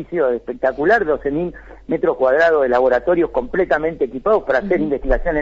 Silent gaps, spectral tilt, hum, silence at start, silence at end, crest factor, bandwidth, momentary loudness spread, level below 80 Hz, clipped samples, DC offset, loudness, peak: none; -7.5 dB/octave; none; 0 s; 0 s; 12 dB; 7.4 kHz; 7 LU; -32 dBFS; under 0.1%; under 0.1%; -18 LUFS; -4 dBFS